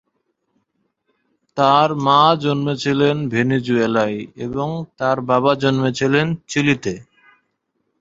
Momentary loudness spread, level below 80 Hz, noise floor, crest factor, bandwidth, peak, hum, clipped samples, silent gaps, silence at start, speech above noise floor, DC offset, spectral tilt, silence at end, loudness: 11 LU; -56 dBFS; -71 dBFS; 18 dB; 7.8 kHz; -2 dBFS; none; under 0.1%; none; 1.55 s; 54 dB; under 0.1%; -6 dB/octave; 1 s; -18 LUFS